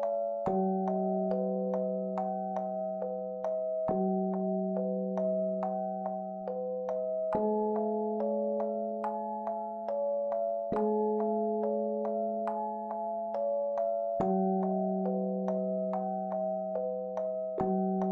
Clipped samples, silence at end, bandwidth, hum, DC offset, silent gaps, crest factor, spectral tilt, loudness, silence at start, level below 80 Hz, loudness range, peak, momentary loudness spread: under 0.1%; 0 s; 3.8 kHz; none; under 0.1%; none; 16 dB; -11 dB/octave; -33 LUFS; 0 s; -70 dBFS; 1 LU; -16 dBFS; 5 LU